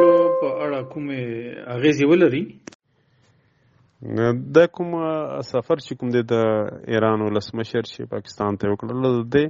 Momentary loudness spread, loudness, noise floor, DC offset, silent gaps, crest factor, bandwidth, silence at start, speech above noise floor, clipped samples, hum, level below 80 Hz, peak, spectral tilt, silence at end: 13 LU; -22 LUFS; -61 dBFS; under 0.1%; 2.75-2.79 s; 18 dB; 7.6 kHz; 0 s; 40 dB; under 0.1%; none; -60 dBFS; -2 dBFS; -6 dB/octave; 0 s